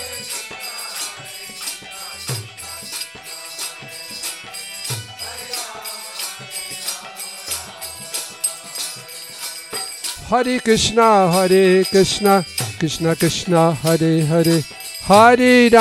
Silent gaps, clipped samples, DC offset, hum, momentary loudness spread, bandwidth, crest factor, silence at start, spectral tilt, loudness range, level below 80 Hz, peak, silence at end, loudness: none; under 0.1%; under 0.1%; none; 17 LU; 17 kHz; 18 dB; 0 s; -4 dB/octave; 13 LU; -50 dBFS; 0 dBFS; 0 s; -18 LUFS